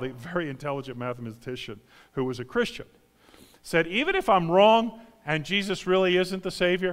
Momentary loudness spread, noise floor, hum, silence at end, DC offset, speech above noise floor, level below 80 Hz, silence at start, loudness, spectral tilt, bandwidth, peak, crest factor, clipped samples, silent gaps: 17 LU; -55 dBFS; none; 0 s; under 0.1%; 30 dB; -54 dBFS; 0 s; -25 LUFS; -5.5 dB/octave; 16 kHz; -6 dBFS; 20 dB; under 0.1%; none